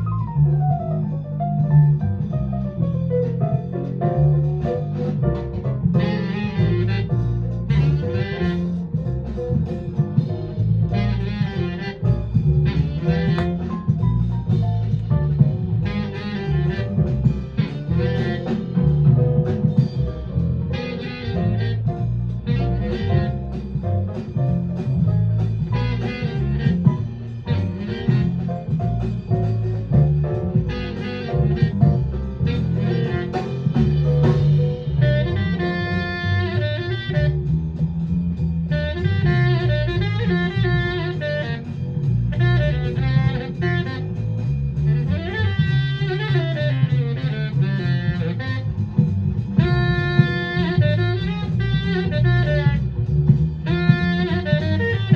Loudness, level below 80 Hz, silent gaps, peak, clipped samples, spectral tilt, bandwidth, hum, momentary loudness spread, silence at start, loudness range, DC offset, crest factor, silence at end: -21 LUFS; -34 dBFS; none; 0 dBFS; under 0.1%; -9 dB/octave; 6.2 kHz; none; 7 LU; 0 s; 3 LU; under 0.1%; 18 dB; 0 s